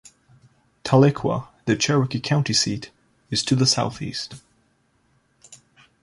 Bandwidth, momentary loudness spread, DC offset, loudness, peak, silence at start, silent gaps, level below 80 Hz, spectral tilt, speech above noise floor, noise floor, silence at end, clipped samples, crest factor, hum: 11.5 kHz; 15 LU; under 0.1%; -21 LUFS; -2 dBFS; 0.85 s; none; -56 dBFS; -4.5 dB/octave; 44 dB; -65 dBFS; 0.5 s; under 0.1%; 22 dB; none